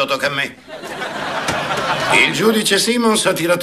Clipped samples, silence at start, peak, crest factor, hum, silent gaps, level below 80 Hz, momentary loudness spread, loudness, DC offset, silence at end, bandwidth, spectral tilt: under 0.1%; 0 s; -2 dBFS; 16 dB; none; none; -52 dBFS; 12 LU; -16 LUFS; under 0.1%; 0 s; 15 kHz; -3 dB/octave